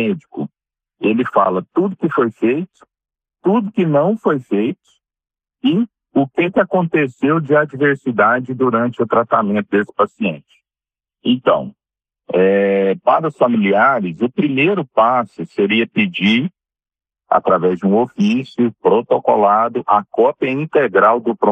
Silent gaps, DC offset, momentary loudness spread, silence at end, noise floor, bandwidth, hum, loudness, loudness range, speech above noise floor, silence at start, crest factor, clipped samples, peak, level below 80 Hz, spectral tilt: none; under 0.1%; 7 LU; 0 s; under -90 dBFS; 8.2 kHz; none; -16 LUFS; 4 LU; over 75 dB; 0 s; 16 dB; under 0.1%; 0 dBFS; -64 dBFS; -8 dB/octave